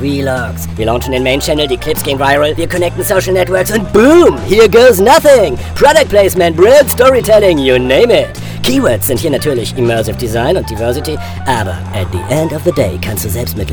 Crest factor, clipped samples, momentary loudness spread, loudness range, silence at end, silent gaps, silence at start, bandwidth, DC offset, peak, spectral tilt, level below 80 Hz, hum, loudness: 10 dB; 1%; 11 LU; 8 LU; 0 s; none; 0 s; over 20 kHz; under 0.1%; 0 dBFS; -5 dB/octave; -28 dBFS; none; -10 LUFS